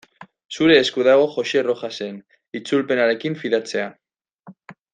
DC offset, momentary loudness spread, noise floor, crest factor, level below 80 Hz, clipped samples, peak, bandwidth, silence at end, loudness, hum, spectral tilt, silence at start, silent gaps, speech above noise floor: under 0.1%; 17 LU; -48 dBFS; 18 dB; -62 dBFS; under 0.1%; -2 dBFS; 9.6 kHz; 0.2 s; -19 LUFS; none; -4.5 dB/octave; 0.2 s; 0.45-0.49 s, 4.39-4.43 s; 29 dB